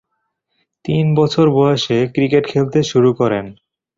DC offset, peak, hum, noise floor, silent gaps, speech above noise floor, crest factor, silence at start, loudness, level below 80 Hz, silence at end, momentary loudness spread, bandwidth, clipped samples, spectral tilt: under 0.1%; -2 dBFS; none; -72 dBFS; none; 57 dB; 14 dB; 0.85 s; -15 LUFS; -52 dBFS; 0.45 s; 8 LU; 7.6 kHz; under 0.1%; -7 dB/octave